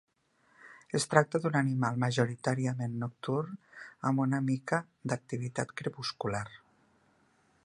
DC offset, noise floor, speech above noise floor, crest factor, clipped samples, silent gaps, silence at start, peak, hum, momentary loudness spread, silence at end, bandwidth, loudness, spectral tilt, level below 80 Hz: under 0.1%; -70 dBFS; 38 dB; 28 dB; under 0.1%; none; 0.65 s; -4 dBFS; none; 10 LU; 1.05 s; 11.5 kHz; -32 LUFS; -6 dB/octave; -70 dBFS